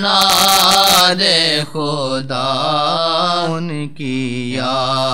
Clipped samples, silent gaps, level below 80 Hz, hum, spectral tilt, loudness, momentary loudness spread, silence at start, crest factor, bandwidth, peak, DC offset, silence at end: under 0.1%; none; -50 dBFS; none; -2.5 dB/octave; -13 LUFS; 12 LU; 0 s; 16 dB; over 20 kHz; 0 dBFS; 2%; 0 s